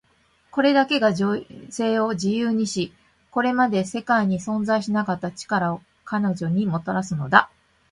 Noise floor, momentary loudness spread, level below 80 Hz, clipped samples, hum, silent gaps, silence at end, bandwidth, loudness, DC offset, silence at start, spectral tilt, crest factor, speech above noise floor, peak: -62 dBFS; 11 LU; -60 dBFS; under 0.1%; none; none; 0.45 s; 11.5 kHz; -22 LUFS; under 0.1%; 0.55 s; -5.5 dB/octave; 22 dB; 40 dB; 0 dBFS